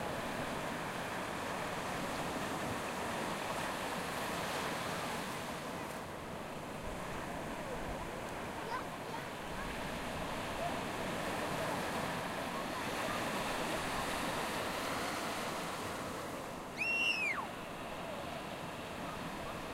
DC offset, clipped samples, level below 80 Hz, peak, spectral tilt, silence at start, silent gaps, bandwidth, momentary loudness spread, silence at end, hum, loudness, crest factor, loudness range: under 0.1%; under 0.1%; -58 dBFS; -24 dBFS; -3.5 dB/octave; 0 s; none; 16 kHz; 6 LU; 0 s; none; -39 LUFS; 16 dB; 5 LU